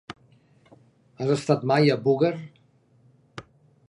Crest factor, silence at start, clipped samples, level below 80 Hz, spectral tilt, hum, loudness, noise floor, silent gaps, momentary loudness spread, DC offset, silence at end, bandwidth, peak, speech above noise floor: 20 dB; 0.1 s; under 0.1%; -68 dBFS; -7 dB/octave; none; -23 LUFS; -60 dBFS; none; 24 LU; under 0.1%; 0.45 s; 11 kHz; -6 dBFS; 38 dB